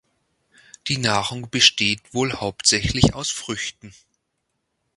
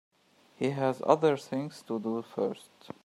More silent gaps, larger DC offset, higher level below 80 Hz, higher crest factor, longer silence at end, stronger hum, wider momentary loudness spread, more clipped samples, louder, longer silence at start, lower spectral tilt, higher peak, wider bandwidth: neither; neither; first, -42 dBFS vs -76 dBFS; about the same, 24 dB vs 24 dB; first, 1.05 s vs 0.45 s; neither; about the same, 13 LU vs 11 LU; neither; first, -20 LUFS vs -30 LUFS; first, 0.85 s vs 0.6 s; second, -3 dB/octave vs -6.5 dB/octave; first, 0 dBFS vs -8 dBFS; second, 11.5 kHz vs 13 kHz